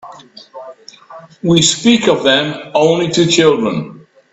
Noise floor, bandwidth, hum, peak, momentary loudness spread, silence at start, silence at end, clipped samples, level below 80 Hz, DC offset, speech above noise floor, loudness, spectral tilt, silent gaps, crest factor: -37 dBFS; 8.4 kHz; none; 0 dBFS; 21 LU; 0.05 s; 0.35 s; under 0.1%; -52 dBFS; under 0.1%; 25 dB; -12 LUFS; -4 dB/octave; none; 14 dB